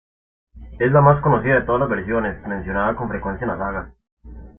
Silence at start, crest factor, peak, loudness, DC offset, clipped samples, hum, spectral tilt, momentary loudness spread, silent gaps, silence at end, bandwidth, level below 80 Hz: 0.55 s; 18 dB; -2 dBFS; -19 LUFS; under 0.1%; under 0.1%; none; -12.5 dB/octave; 12 LU; 4.12-4.17 s; 0.1 s; 3.6 kHz; -40 dBFS